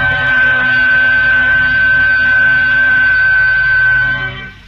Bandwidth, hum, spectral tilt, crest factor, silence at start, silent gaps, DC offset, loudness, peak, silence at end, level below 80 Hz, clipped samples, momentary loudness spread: 6.4 kHz; none; -5 dB/octave; 8 dB; 0 s; none; under 0.1%; -9 LUFS; -4 dBFS; 0.15 s; -34 dBFS; under 0.1%; 2 LU